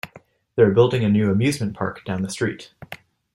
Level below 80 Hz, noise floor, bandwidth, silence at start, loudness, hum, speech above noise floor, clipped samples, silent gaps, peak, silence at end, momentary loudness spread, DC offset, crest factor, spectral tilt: -56 dBFS; -50 dBFS; 13.5 kHz; 0.05 s; -21 LUFS; none; 30 dB; under 0.1%; none; -4 dBFS; 0.4 s; 22 LU; under 0.1%; 18 dB; -6.5 dB/octave